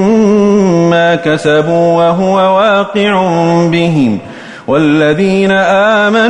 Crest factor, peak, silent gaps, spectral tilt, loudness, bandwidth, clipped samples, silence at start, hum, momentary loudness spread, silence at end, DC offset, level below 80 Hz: 8 dB; 0 dBFS; none; -6.5 dB/octave; -9 LUFS; 10.5 kHz; under 0.1%; 0 s; none; 4 LU; 0 s; under 0.1%; -46 dBFS